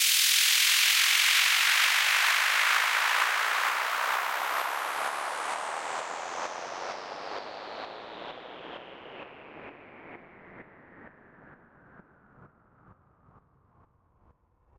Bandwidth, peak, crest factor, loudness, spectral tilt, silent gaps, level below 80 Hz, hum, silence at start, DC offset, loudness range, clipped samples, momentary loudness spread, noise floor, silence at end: 16.5 kHz; -10 dBFS; 20 dB; -24 LUFS; 2 dB/octave; none; -74 dBFS; none; 0 s; under 0.1%; 24 LU; under 0.1%; 23 LU; -65 dBFS; 2.3 s